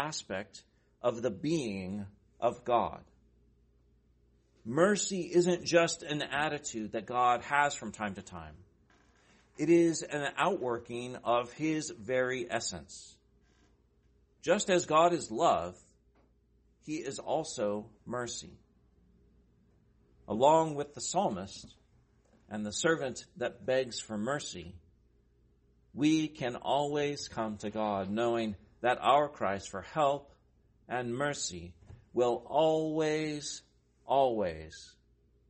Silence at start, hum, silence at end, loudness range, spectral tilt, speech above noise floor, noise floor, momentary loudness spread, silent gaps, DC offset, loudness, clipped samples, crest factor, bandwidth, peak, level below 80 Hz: 0 s; none; 0.6 s; 5 LU; -4.5 dB/octave; 37 dB; -68 dBFS; 15 LU; none; under 0.1%; -32 LUFS; under 0.1%; 22 dB; 8.8 kHz; -12 dBFS; -66 dBFS